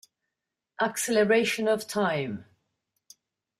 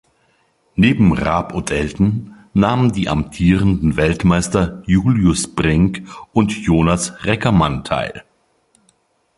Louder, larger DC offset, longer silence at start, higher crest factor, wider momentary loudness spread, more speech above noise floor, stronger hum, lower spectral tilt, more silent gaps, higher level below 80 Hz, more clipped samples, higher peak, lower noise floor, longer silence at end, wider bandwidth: second, -26 LUFS vs -17 LUFS; neither; about the same, 0.8 s vs 0.75 s; about the same, 18 dB vs 16 dB; first, 10 LU vs 7 LU; first, 61 dB vs 45 dB; neither; second, -4 dB/octave vs -6 dB/octave; neither; second, -72 dBFS vs -32 dBFS; neither; second, -12 dBFS vs 0 dBFS; first, -86 dBFS vs -60 dBFS; about the same, 1.15 s vs 1.15 s; first, 15.5 kHz vs 11.5 kHz